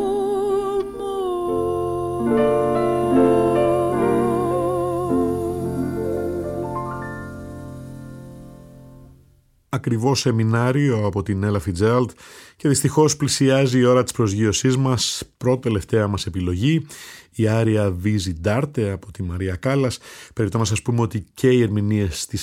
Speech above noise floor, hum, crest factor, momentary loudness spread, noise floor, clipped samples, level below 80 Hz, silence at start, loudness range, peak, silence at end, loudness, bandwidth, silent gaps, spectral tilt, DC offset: 37 dB; none; 16 dB; 12 LU; -56 dBFS; under 0.1%; -46 dBFS; 0 s; 8 LU; -4 dBFS; 0 s; -21 LUFS; 16 kHz; none; -6 dB/octave; under 0.1%